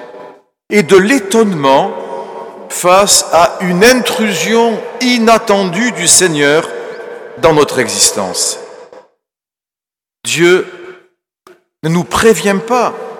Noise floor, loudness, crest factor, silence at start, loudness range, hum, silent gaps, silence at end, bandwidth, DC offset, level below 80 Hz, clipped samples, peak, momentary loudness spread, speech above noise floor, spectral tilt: -89 dBFS; -10 LUFS; 12 dB; 0 s; 7 LU; none; none; 0 s; over 20 kHz; under 0.1%; -44 dBFS; 0.4%; 0 dBFS; 16 LU; 79 dB; -3 dB/octave